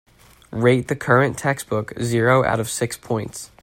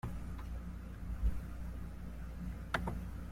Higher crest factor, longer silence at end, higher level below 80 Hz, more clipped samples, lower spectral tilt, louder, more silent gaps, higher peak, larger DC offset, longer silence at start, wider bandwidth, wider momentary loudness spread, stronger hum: about the same, 20 dB vs 22 dB; first, 0.15 s vs 0 s; second, -52 dBFS vs -42 dBFS; neither; about the same, -5.5 dB/octave vs -6.5 dB/octave; first, -20 LUFS vs -44 LUFS; neither; first, -2 dBFS vs -18 dBFS; neither; first, 0.5 s vs 0.05 s; about the same, 16.5 kHz vs 15.5 kHz; about the same, 9 LU vs 8 LU; neither